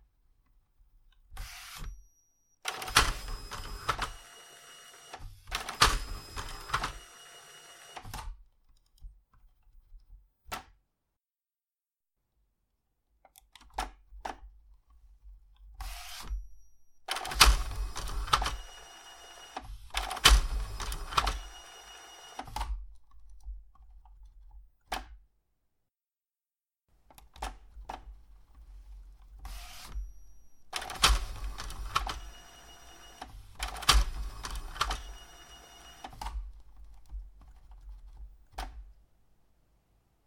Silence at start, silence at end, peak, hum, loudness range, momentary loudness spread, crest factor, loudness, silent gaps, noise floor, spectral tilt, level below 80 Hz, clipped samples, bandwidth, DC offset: 1.3 s; 1.35 s; -2 dBFS; none; 20 LU; 25 LU; 34 dB; -32 LUFS; none; under -90 dBFS; -1.5 dB/octave; -40 dBFS; under 0.1%; 16.5 kHz; under 0.1%